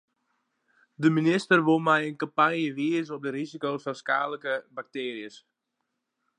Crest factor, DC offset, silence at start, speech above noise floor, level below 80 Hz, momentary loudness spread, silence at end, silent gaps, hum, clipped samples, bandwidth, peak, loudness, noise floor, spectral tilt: 22 dB; under 0.1%; 1 s; 55 dB; -82 dBFS; 12 LU; 1 s; none; none; under 0.1%; 10 kHz; -6 dBFS; -26 LUFS; -81 dBFS; -6 dB/octave